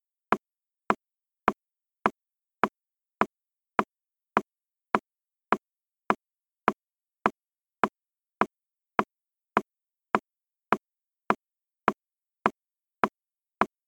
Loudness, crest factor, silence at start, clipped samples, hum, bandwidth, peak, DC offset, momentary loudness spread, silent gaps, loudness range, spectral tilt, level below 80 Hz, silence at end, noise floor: -31 LUFS; 30 dB; 0.3 s; under 0.1%; none; 17 kHz; -2 dBFS; under 0.1%; 0 LU; none; 1 LU; -6 dB/octave; -68 dBFS; 0.2 s; under -90 dBFS